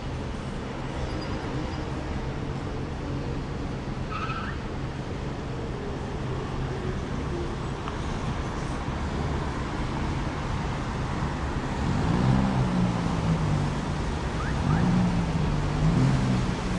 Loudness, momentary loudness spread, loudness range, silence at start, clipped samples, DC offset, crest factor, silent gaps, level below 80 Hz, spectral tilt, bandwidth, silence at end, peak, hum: -29 LUFS; 10 LU; 7 LU; 0 s; under 0.1%; under 0.1%; 16 dB; none; -36 dBFS; -7 dB/octave; 11 kHz; 0 s; -10 dBFS; none